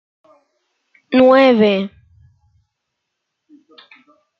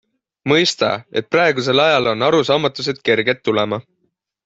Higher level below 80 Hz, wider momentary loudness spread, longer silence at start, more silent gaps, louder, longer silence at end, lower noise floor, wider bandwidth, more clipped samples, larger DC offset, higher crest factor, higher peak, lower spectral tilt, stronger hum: about the same, -62 dBFS vs -58 dBFS; first, 12 LU vs 7 LU; first, 1.1 s vs 0.45 s; neither; first, -13 LUFS vs -16 LUFS; first, 2.5 s vs 0.65 s; first, -76 dBFS vs -69 dBFS; second, 6 kHz vs 8 kHz; neither; neither; about the same, 18 dB vs 16 dB; about the same, -2 dBFS vs -2 dBFS; first, -7.5 dB/octave vs -4.5 dB/octave; neither